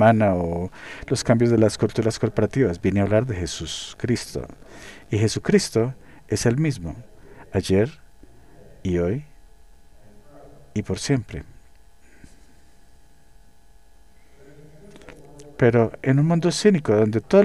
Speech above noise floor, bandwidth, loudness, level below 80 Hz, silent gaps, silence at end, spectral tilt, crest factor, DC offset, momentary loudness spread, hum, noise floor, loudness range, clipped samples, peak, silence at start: 33 dB; 12.5 kHz; -22 LUFS; -46 dBFS; none; 0 s; -6 dB/octave; 20 dB; 0.4%; 16 LU; none; -54 dBFS; 10 LU; under 0.1%; -4 dBFS; 0 s